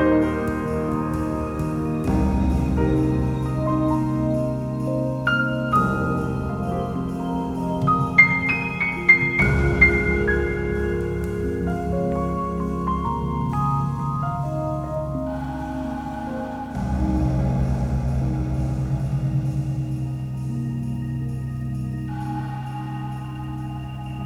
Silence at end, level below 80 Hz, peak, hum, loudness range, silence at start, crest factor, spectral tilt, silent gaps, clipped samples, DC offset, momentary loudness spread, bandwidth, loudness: 0 s; -32 dBFS; -2 dBFS; none; 9 LU; 0 s; 20 dB; -8 dB/octave; none; under 0.1%; under 0.1%; 12 LU; 12.5 kHz; -23 LUFS